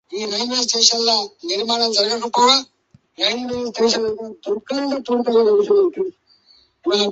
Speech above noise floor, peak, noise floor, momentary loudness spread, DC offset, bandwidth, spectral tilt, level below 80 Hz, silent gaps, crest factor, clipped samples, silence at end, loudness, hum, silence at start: 37 dB; 0 dBFS; -55 dBFS; 11 LU; under 0.1%; 8.2 kHz; -1.5 dB/octave; -62 dBFS; none; 20 dB; under 0.1%; 0 s; -18 LUFS; none; 0.1 s